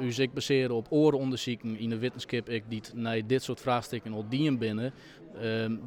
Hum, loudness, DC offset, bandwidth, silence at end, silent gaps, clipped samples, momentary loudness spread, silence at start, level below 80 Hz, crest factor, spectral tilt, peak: none; -31 LUFS; under 0.1%; 17 kHz; 0 s; none; under 0.1%; 11 LU; 0 s; -66 dBFS; 18 dB; -6 dB/octave; -12 dBFS